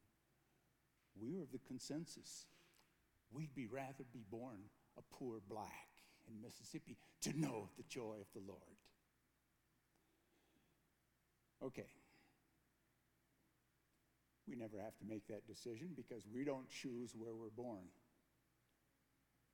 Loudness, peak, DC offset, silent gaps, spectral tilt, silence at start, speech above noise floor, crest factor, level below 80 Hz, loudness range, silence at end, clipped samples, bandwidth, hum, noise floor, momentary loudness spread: -52 LUFS; -32 dBFS; under 0.1%; none; -5 dB/octave; 1.15 s; 31 dB; 22 dB; -86 dBFS; 11 LU; 1.5 s; under 0.1%; 19 kHz; none; -83 dBFS; 15 LU